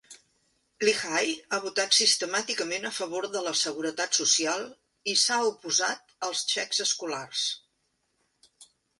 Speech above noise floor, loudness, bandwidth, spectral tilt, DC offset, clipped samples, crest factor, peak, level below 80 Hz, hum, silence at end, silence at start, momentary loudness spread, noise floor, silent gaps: 47 dB; -26 LUFS; 11.5 kHz; 0 dB/octave; under 0.1%; under 0.1%; 22 dB; -8 dBFS; -78 dBFS; none; 0.35 s; 0.1 s; 9 LU; -75 dBFS; none